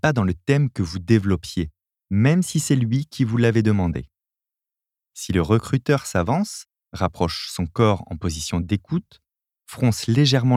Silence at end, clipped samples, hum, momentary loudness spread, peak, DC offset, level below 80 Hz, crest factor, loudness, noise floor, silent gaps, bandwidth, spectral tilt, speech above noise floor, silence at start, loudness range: 0 s; under 0.1%; none; 10 LU; -4 dBFS; under 0.1%; -44 dBFS; 18 dB; -22 LUFS; -88 dBFS; none; 15.5 kHz; -6 dB/octave; 68 dB; 0.05 s; 3 LU